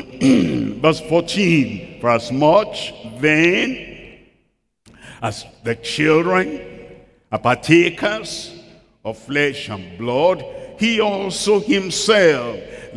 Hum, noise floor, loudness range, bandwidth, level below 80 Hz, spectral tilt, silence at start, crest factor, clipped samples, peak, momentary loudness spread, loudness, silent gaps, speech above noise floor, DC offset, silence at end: none; -65 dBFS; 4 LU; 12 kHz; -50 dBFS; -5 dB/octave; 0 s; 18 dB; under 0.1%; 0 dBFS; 16 LU; -17 LUFS; none; 48 dB; under 0.1%; 0 s